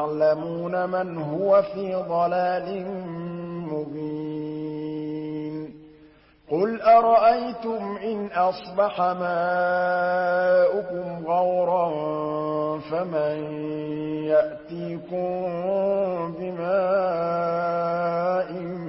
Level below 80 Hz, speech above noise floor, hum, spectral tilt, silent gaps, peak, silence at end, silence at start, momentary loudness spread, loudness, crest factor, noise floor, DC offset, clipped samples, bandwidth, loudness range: -62 dBFS; 30 dB; none; -11 dB/octave; none; -6 dBFS; 0 s; 0 s; 11 LU; -24 LUFS; 18 dB; -53 dBFS; under 0.1%; under 0.1%; 5.8 kHz; 7 LU